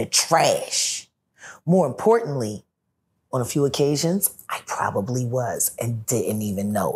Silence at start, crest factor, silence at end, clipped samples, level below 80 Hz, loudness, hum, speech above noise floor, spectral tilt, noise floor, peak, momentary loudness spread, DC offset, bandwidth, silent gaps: 0 s; 20 dB; 0 s; under 0.1%; -62 dBFS; -22 LUFS; none; 52 dB; -4 dB/octave; -74 dBFS; -4 dBFS; 11 LU; under 0.1%; 16 kHz; none